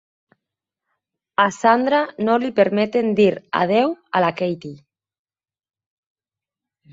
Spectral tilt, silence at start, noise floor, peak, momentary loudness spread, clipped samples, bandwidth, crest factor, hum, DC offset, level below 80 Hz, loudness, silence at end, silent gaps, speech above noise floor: -6 dB/octave; 1.4 s; -89 dBFS; -2 dBFS; 9 LU; under 0.1%; 8 kHz; 20 dB; none; under 0.1%; -66 dBFS; -19 LUFS; 2.15 s; none; 71 dB